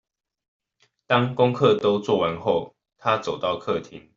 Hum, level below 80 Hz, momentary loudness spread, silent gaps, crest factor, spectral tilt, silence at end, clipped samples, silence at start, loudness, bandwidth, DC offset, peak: none; -62 dBFS; 9 LU; none; 20 dB; -6.5 dB/octave; 0.15 s; under 0.1%; 1.1 s; -23 LUFS; 7.6 kHz; under 0.1%; -4 dBFS